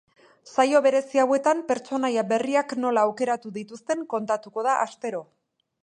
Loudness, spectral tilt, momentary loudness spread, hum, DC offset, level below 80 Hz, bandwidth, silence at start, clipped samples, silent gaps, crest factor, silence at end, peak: -24 LUFS; -4 dB/octave; 10 LU; none; under 0.1%; -78 dBFS; 10 kHz; 0.45 s; under 0.1%; none; 18 dB; 0.6 s; -6 dBFS